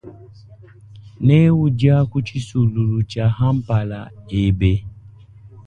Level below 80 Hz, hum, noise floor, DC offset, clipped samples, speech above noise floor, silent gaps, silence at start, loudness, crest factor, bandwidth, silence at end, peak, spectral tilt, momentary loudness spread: -36 dBFS; none; -43 dBFS; under 0.1%; under 0.1%; 25 dB; none; 0.05 s; -18 LUFS; 16 dB; 9.2 kHz; 0.05 s; -2 dBFS; -8.5 dB/octave; 11 LU